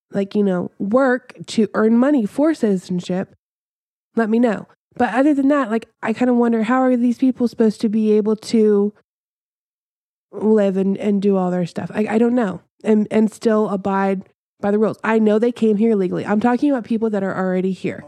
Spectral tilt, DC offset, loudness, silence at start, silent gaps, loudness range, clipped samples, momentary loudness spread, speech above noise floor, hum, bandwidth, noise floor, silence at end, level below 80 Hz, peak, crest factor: -7.5 dB/octave; under 0.1%; -18 LUFS; 0.1 s; 3.39-4.11 s, 4.76-4.91 s, 9.04-10.29 s, 12.70-12.78 s, 14.35-14.57 s; 3 LU; under 0.1%; 7 LU; over 73 dB; none; 11 kHz; under -90 dBFS; 0 s; -66 dBFS; -2 dBFS; 16 dB